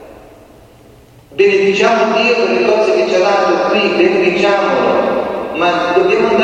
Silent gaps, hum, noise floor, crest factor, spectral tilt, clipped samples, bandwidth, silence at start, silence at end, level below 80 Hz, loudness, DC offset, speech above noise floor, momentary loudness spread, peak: none; none; -42 dBFS; 12 dB; -4.5 dB/octave; under 0.1%; 9 kHz; 0 s; 0 s; -50 dBFS; -12 LUFS; under 0.1%; 30 dB; 4 LU; 0 dBFS